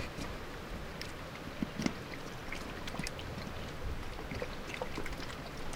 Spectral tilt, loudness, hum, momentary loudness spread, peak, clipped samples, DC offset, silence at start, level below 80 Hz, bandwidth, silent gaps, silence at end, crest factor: -4.5 dB/octave; -42 LUFS; none; 6 LU; -14 dBFS; under 0.1%; under 0.1%; 0 s; -48 dBFS; 17.5 kHz; none; 0 s; 26 dB